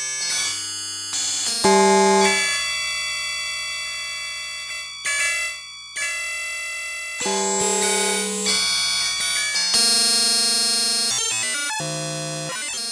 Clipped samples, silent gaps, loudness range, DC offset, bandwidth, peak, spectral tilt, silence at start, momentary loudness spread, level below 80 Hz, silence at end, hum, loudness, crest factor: under 0.1%; none; 7 LU; under 0.1%; 11 kHz; -4 dBFS; -1 dB/octave; 0 s; 11 LU; -60 dBFS; 0 s; none; -20 LUFS; 18 dB